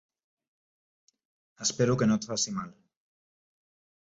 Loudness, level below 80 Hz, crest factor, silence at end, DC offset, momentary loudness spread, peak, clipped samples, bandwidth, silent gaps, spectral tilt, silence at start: -28 LUFS; -66 dBFS; 20 dB; 1.35 s; under 0.1%; 11 LU; -14 dBFS; under 0.1%; 8 kHz; none; -4.5 dB/octave; 1.6 s